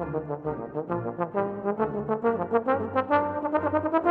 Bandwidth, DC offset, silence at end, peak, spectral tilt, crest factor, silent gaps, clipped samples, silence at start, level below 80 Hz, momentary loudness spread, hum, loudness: 4.8 kHz; under 0.1%; 0 s; -10 dBFS; -10 dB/octave; 16 dB; none; under 0.1%; 0 s; -58 dBFS; 7 LU; none; -27 LUFS